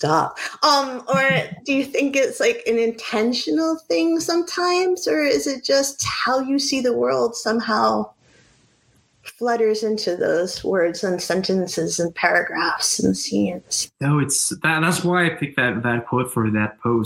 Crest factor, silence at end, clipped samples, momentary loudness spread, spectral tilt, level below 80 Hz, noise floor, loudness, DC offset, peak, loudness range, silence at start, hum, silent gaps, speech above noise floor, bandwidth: 18 dB; 0 s; under 0.1%; 4 LU; -4 dB/octave; -58 dBFS; -60 dBFS; -20 LUFS; under 0.1%; -2 dBFS; 3 LU; 0 s; none; none; 39 dB; 16.5 kHz